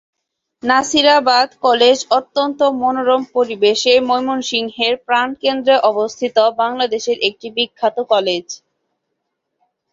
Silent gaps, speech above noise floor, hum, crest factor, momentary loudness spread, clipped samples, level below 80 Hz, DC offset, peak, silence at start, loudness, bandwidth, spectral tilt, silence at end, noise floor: none; 59 dB; none; 16 dB; 8 LU; under 0.1%; -62 dBFS; under 0.1%; 0 dBFS; 0.65 s; -15 LUFS; 8 kHz; -2 dB/octave; 1.35 s; -74 dBFS